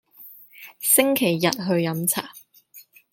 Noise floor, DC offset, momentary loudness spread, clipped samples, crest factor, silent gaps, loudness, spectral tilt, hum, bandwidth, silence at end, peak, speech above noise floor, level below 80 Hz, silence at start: -51 dBFS; under 0.1%; 25 LU; under 0.1%; 22 dB; none; -21 LUFS; -3.5 dB/octave; none; 17 kHz; 0.3 s; -2 dBFS; 29 dB; -70 dBFS; 0.2 s